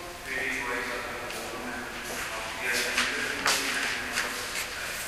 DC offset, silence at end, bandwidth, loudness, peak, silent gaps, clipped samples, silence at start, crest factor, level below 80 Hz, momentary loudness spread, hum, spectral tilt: under 0.1%; 0 s; 15.5 kHz; -29 LUFS; -8 dBFS; none; under 0.1%; 0 s; 22 dB; -54 dBFS; 9 LU; none; -1 dB/octave